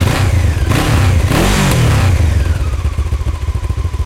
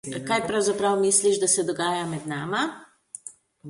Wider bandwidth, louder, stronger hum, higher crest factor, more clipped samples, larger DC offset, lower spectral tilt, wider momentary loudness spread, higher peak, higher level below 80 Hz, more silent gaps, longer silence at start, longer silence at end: first, 16 kHz vs 11.5 kHz; first, -14 LUFS vs -23 LUFS; neither; second, 12 dB vs 18 dB; neither; neither; first, -5.5 dB/octave vs -3 dB/octave; second, 7 LU vs 20 LU; first, 0 dBFS vs -6 dBFS; first, -16 dBFS vs -66 dBFS; neither; about the same, 0 s vs 0.05 s; about the same, 0 s vs 0 s